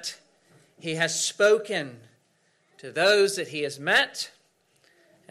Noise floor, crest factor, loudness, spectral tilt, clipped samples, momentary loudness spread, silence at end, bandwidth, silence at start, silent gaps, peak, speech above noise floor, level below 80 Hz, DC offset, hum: -67 dBFS; 18 dB; -24 LUFS; -2 dB/octave; under 0.1%; 16 LU; 1 s; 15.5 kHz; 0 s; none; -10 dBFS; 43 dB; -74 dBFS; under 0.1%; none